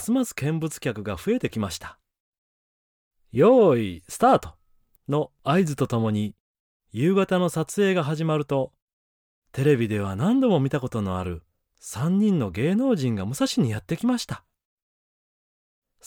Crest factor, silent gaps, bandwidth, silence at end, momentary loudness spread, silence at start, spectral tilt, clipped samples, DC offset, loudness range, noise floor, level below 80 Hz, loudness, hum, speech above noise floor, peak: 18 dB; 2.20-3.11 s, 6.40-6.80 s, 8.82-9.42 s; 18.5 kHz; 1.7 s; 14 LU; 0 s; -6.5 dB/octave; under 0.1%; under 0.1%; 4 LU; -63 dBFS; -56 dBFS; -24 LUFS; none; 40 dB; -8 dBFS